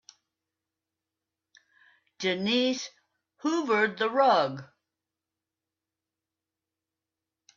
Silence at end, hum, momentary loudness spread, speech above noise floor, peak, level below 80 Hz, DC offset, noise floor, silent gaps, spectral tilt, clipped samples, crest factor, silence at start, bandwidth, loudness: 2.9 s; none; 12 LU; 63 dB; -10 dBFS; -80 dBFS; under 0.1%; -89 dBFS; none; -4 dB/octave; under 0.1%; 20 dB; 2.2 s; 7.4 kHz; -27 LUFS